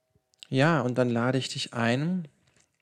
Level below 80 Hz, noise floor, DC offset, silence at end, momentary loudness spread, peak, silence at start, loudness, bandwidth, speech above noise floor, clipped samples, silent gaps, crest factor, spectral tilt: -74 dBFS; -55 dBFS; under 0.1%; 0.55 s; 8 LU; -8 dBFS; 0.5 s; -27 LUFS; 10.5 kHz; 29 dB; under 0.1%; none; 18 dB; -6 dB/octave